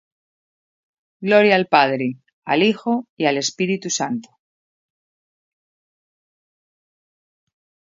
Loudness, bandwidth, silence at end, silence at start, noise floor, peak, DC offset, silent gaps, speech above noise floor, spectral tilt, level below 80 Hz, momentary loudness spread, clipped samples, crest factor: -19 LUFS; 7.8 kHz; 3.7 s; 1.2 s; under -90 dBFS; 0 dBFS; under 0.1%; 2.33-2.42 s, 3.09-3.17 s; over 72 dB; -4 dB/octave; -72 dBFS; 13 LU; under 0.1%; 22 dB